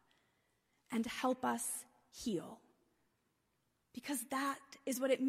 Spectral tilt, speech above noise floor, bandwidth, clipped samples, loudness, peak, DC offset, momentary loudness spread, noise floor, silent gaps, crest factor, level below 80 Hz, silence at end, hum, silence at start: -3 dB/octave; 43 dB; 15.5 kHz; under 0.1%; -40 LUFS; -22 dBFS; under 0.1%; 17 LU; -82 dBFS; none; 20 dB; -76 dBFS; 0 s; none; 0.9 s